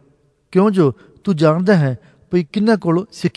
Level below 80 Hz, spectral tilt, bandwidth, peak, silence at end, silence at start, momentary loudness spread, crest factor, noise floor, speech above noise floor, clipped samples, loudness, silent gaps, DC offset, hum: -56 dBFS; -8 dB/octave; 11 kHz; -2 dBFS; 0.05 s; 0.5 s; 8 LU; 16 dB; -57 dBFS; 41 dB; under 0.1%; -17 LUFS; none; under 0.1%; none